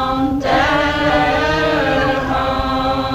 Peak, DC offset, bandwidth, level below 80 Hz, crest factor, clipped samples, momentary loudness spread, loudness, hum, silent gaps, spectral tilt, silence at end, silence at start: -2 dBFS; under 0.1%; 15.5 kHz; -30 dBFS; 14 dB; under 0.1%; 3 LU; -16 LUFS; none; none; -5.5 dB/octave; 0 s; 0 s